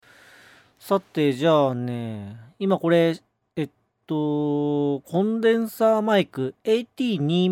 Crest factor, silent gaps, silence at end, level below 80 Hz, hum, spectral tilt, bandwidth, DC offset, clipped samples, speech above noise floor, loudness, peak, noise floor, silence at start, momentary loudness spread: 16 dB; none; 0 s; -72 dBFS; none; -7 dB/octave; 17 kHz; under 0.1%; under 0.1%; 30 dB; -23 LUFS; -8 dBFS; -52 dBFS; 0.85 s; 12 LU